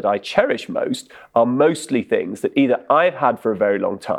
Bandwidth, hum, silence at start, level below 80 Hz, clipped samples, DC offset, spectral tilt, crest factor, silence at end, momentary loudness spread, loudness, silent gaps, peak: 13.5 kHz; none; 0 s; -62 dBFS; under 0.1%; under 0.1%; -5.5 dB/octave; 18 dB; 0 s; 7 LU; -19 LUFS; none; 0 dBFS